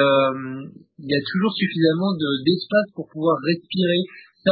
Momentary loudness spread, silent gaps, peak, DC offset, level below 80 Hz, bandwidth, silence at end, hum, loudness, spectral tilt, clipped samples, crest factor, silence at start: 13 LU; none; -4 dBFS; under 0.1%; -62 dBFS; 5.2 kHz; 0 s; none; -21 LUFS; -11 dB/octave; under 0.1%; 18 dB; 0 s